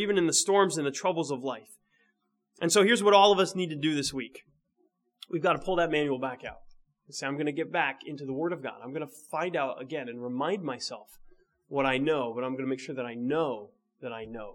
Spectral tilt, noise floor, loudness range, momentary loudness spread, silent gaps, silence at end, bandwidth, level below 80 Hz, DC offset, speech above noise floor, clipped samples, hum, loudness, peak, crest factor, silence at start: -3.5 dB/octave; -76 dBFS; 8 LU; 17 LU; none; 0 s; 17 kHz; -62 dBFS; under 0.1%; 47 dB; under 0.1%; none; -28 LUFS; -6 dBFS; 24 dB; 0 s